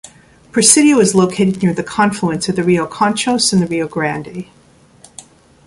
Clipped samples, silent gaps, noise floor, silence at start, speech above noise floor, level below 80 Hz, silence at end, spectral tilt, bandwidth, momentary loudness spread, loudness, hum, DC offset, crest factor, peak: under 0.1%; none; -46 dBFS; 0.05 s; 32 dB; -50 dBFS; 0.45 s; -4 dB/octave; 14.5 kHz; 11 LU; -14 LUFS; none; under 0.1%; 16 dB; 0 dBFS